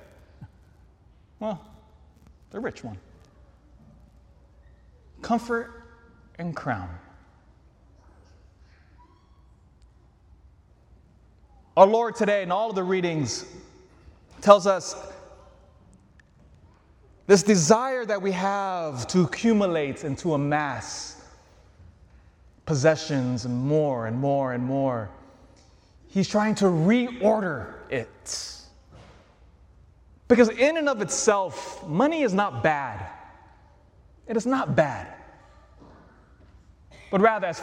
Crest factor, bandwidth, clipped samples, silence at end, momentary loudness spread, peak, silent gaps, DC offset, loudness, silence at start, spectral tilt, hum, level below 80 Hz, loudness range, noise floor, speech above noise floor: 26 dB; 12.5 kHz; under 0.1%; 0 s; 20 LU; 0 dBFS; none; under 0.1%; -24 LUFS; 0.4 s; -5 dB/octave; none; -56 dBFS; 15 LU; -56 dBFS; 33 dB